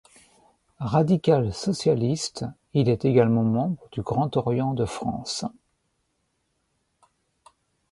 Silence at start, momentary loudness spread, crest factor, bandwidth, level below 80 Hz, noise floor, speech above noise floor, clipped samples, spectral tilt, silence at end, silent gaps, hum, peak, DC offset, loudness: 0.8 s; 11 LU; 20 dB; 11.5 kHz; -54 dBFS; -74 dBFS; 50 dB; under 0.1%; -6.5 dB/octave; 2.4 s; none; none; -6 dBFS; under 0.1%; -24 LUFS